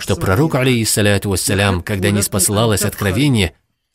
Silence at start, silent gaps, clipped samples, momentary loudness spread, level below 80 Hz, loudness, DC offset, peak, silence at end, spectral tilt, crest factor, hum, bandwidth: 0 s; none; under 0.1%; 4 LU; -38 dBFS; -15 LUFS; under 0.1%; 0 dBFS; 0.45 s; -4.5 dB/octave; 16 dB; none; 16.5 kHz